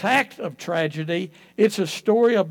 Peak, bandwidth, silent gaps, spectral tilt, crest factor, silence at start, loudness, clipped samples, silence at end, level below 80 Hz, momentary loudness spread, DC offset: -4 dBFS; 18 kHz; none; -5 dB/octave; 16 dB; 0 s; -22 LUFS; under 0.1%; 0 s; -76 dBFS; 11 LU; under 0.1%